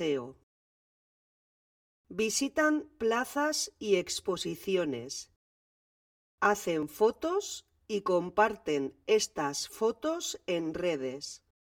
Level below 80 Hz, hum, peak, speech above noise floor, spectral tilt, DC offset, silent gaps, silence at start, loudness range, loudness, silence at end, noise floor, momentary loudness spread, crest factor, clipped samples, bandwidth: -66 dBFS; none; -10 dBFS; over 59 dB; -3 dB/octave; under 0.1%; 0.43-2.04 s, 5.36-6.38 s; 0 s; 3 LU; -31 LUFS; 0.25 s; under -90 dBFS; 10 LU; 22 dB; under 0.1%; 19 kHz